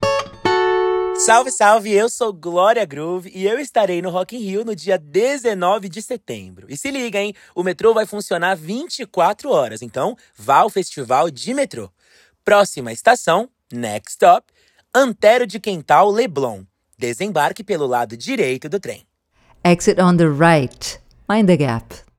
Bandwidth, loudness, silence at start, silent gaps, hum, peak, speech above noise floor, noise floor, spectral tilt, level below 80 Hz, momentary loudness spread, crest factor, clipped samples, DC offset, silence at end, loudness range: 16.5 kHz; -18 LUFS; 0 s; none; none; 0 dBFS; 39 dB; -56 dBFS; -4.5 dB/octave; -54 dBFS; 13 LU; 18 dB; under 0.1%; under 0.1%; 0.2 s; 5 LU